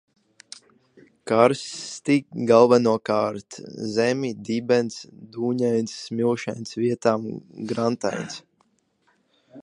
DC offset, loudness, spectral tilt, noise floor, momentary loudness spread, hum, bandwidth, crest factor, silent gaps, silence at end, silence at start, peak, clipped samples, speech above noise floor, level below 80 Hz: under 0.1%; -23 LUFS; -5.5 dB/octave; -67 dBFS; 20 LU; none; 11 kHz; 22 dB; none; 0 s; 1.25 s; -2 dBFS; under 0.1%; 44 dB; -68 dBFS